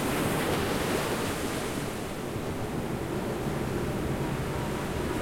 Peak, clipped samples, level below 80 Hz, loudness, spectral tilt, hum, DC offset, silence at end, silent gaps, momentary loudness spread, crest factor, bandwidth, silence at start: -16 dBFS; under 0.1%; -44 dBFS; -31 LUFS; -5 dB/octave; none; under 0.1%; 0 s; none; 5 LU; 14 dB; 16.5 kHz; 0 s